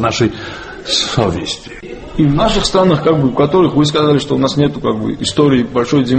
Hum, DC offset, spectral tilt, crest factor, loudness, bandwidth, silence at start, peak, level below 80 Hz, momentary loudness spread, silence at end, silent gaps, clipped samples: none; under 0.1%; -5.5 dB/octave; 14 dB; -13 LUFS; 8.8 kHz; 0 s; 0 dBFS; -32 dBFS; 13 LU; 0 s; none; under 0.1%